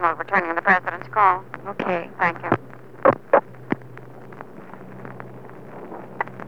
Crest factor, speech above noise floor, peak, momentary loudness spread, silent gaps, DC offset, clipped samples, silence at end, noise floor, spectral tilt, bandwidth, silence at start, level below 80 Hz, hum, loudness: 22 dB; 19 dB; -2 dBFS; 22 LU; none; 0.6%; under 0.1%; 0 s; -41 dBFS; -7.5 dB/octave; 7 kHz; 0 s; -66 dBFS; none; -22 LUFS